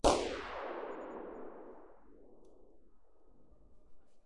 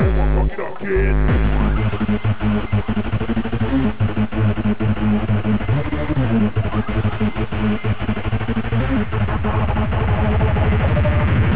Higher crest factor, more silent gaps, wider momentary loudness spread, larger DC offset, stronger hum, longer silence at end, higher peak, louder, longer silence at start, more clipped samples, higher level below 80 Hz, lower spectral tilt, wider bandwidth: first, 26 dB vs 10 dB; neither; first, 26 LU vs 5 LU; second, 0.2% vs 5%; neither; about the same, 0 s vs 0 s; second, -14 dBFS vs -8 dBFS; second, -40 LUFS vs -20 LUFS; about the same, 0 s vs 0 s; neither; second, -54 dBFS vs -24 dBFS; second, -3.5 dB/octave vs -11.5 dB/octave; first, 11.5 kHz vs 4 kHz